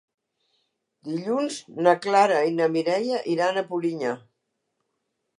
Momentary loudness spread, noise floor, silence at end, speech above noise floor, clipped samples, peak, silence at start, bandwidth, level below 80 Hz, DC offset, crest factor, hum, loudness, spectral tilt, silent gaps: 12 LU; -78 dBFS; 1.2 s; 55 dB; under 0.1%; -6 dBFS; 1.05 s; 11.5 kHz; -82 dBFS; under 0.1%; 20 dB; none; -24 LUFS; -5 dB/octave; none